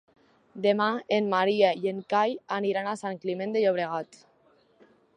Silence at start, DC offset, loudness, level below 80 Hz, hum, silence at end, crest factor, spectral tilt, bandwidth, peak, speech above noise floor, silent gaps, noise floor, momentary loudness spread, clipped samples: 0.55 s; under 0.1%; -27 LUFS; -80 dBFS; none; 1.1 s; 20 dB; -5.5 dB/octave; 10.5 kHz; -8 dBFS; 37 dB; none; -63 dBFS; 9 LU; under 0.1%